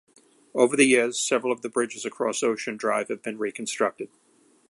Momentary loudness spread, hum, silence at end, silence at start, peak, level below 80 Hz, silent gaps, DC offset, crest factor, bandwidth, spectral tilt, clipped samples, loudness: 12 LU; none; 0.65 s; 0.55 s; -4 dBFS; -76 dBFS; none; under 0.1%; 22 dB; 11.5 kHz; -2.5 dB/octave; under 0.1%; -25 LUFS